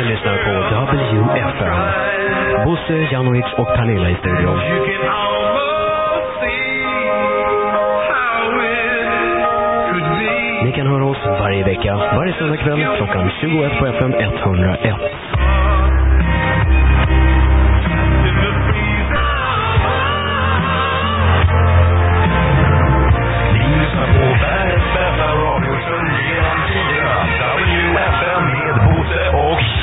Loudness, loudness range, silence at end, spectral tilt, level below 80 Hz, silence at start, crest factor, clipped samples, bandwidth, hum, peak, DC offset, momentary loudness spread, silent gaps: -15 LUFS; 3 LU; 0 s; -11.5 dB/octave; -20 dBFS; 0 s; 14 dB; under 0.1%; 4 kHz; none; 0 dBFS; 0.3%; 4 LU; none